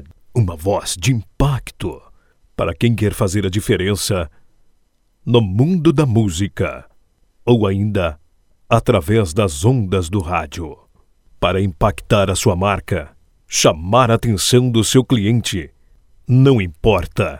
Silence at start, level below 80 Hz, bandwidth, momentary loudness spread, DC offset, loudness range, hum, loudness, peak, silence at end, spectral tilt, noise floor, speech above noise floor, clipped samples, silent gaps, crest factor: 0 s; -34 dBFS; 17 kHz; 11 LU; under 0.1%; 4 LU; none; -17 LUFS; 0 dBFS; 0 s; -5.5 dB/octave; -58 dBFS; 42 dB; under 0.1%; none; 16 dB